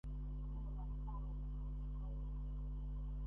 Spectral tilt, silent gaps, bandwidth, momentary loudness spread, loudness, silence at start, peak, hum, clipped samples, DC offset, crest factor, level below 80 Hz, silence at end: -10.5 dB/octave; none; 3.2 kHz; 0 LU; -48 LUFS; 0.05 s; -36 dBFS; 50 Hz at -45 dBFS; under 0.1%; under 0.1%; 6 dB; -44 dBFS; 0 s